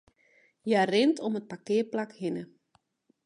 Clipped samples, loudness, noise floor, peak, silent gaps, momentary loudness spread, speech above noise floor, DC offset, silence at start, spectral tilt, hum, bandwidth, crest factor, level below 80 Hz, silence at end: under 0.1%; -29 LUFS; -71 dBFS; -12 dBFS; none; 14 LU; 43 dB; under 0.1%; 0.65 s; -5.5 dB/octave; none; 10.5 kHz; 18 dB; -80 dBFS; 0.8 s